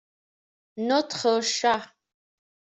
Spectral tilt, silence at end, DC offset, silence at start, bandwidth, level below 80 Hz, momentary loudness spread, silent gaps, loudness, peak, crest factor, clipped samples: -2 dB/octave; 0.8 s; under 0.1%; 0.75 s; 8.2 kHz; -72 dBFS; 8 LU; none; -25 LUFS; -10 dBFS; 18 dB; under 0.1%